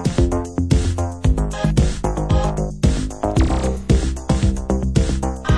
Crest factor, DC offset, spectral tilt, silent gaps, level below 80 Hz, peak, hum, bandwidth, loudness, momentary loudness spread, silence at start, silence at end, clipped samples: 16 dB; under 0.1%; -6.5 dB/octave; none; -22 dBFS; -2 dBFS; none; 11 kHz; -20 LUFS; 4 LU; 0 s; 0 s; under 0.1%